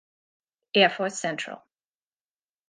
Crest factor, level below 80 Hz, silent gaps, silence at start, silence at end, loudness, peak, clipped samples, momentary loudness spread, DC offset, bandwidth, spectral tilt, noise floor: 24 dB; -82 dBFS; none; 0.75 s; 1.1 s; -24 LUFS; -6 dBFS; under 0.1%; 16 LU; under 0.1%; 9.8 kHz; -3 dB/octave; under -90 dBFS